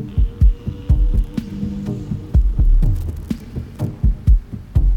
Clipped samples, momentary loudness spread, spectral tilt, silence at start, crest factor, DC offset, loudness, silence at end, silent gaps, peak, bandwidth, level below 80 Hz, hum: under 0.1%; 10 LU; -9 dB/octave; 0 s; 14 dB; under 0.1%; -21 LUFS; 0 s; none; -4 dBFS; 4.8 kHz; -18 dBFS; none